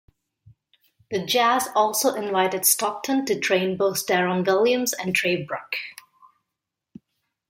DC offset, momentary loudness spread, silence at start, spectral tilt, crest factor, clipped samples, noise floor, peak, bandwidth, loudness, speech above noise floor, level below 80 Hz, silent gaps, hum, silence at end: under 0.1%; 10 LU; 1.1 s; -3 dB/octave; 20 dB; under 0.1%; -84 dBFS; -4 dBFS; 16.5 kHz; -22 LUFS; 62 dB; -70 dBFS; none; none; 1.6 s